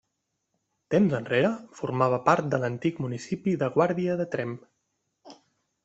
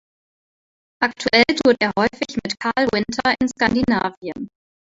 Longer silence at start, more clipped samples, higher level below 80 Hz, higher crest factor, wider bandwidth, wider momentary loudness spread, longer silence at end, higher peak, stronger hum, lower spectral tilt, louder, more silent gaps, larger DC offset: about the same, 0.9 s vs 1 s; neither; second, -66 dBFS vs -50 dBFS; about the same, 22 dB vs 20 dB; about the same, 8.2 kHz vs 8 kHz; second, 9 LU vs 12 LU; about the same, 0.5 s vs 0.45 s; about the same, -4 dBFS vs -2 dBFS; neither; first, -7 dB/octave vs -4 dB/octave; second, -26 LUFS vs -19 LUFS; second, none vs 4.17-4.21 s; neither